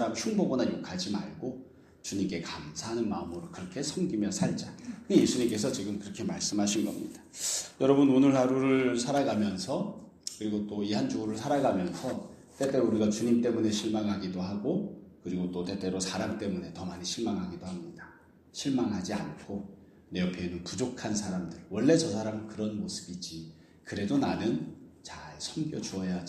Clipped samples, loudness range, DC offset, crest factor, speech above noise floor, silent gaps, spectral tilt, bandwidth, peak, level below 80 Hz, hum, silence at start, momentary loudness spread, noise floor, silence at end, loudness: under 0.1%; 8 LU; under 0.1%; 22 dB; 26 dB; none; -5 dB/octave; 15 kHz; -10 dBFS; -64 dBFS; none; 0 s; 15 LU; -56 dBFS; 0 s; -31 LUFS